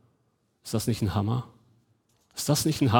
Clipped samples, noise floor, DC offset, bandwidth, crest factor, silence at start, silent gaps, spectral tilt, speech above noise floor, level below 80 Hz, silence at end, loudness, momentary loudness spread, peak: under 0.1%; -71 dBFS; under 0.1%; over 20 kHz; 24 dB; 0.65 s; none; -5.5 dB/octave; 46 dB; -56 dBFS; 0 s; -28 LUFS; 18 LU; -4 dBFS